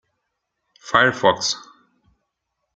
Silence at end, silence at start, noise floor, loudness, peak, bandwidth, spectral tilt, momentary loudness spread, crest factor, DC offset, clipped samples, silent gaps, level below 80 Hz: 1.15 s; 0.85 s; -77 dBFS; -19 LUFS; -2 dBFS; 9.4 kHz; -2.5 dB/octave; 9 LU; 22 dB; under 0.1%; under 0.1%; none; -60 dBFS